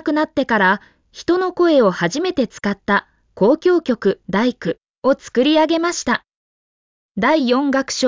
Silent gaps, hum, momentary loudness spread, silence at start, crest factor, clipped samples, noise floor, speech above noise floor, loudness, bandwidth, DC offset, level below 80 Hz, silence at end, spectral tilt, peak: 4.90-5.02 s, 6.35-7.15 s; none; 7 LU; 0.05 s; 14 dB; under 0.1%; under -90 dBFS; over 73 dB; -18 LUFS; 7.6 kHz; under 0.1%; -54 dBFS; 0 s; -4.5 dB/octave; -4 dBFS